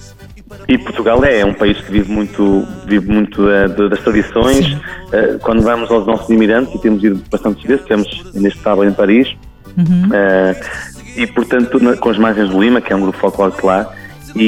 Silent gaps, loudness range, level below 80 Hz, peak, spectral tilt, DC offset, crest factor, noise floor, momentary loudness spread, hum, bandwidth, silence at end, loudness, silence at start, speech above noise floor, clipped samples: none; 1 LU; -32 dBFS; 0 dBFS; -6.5 dB/octave; under 0.1%; 12 dB; -35 dBFS; 7 LU; none; 15.5 kHz; 0 s; -13 LUFS; 0 s; 23 dB; under 0.1%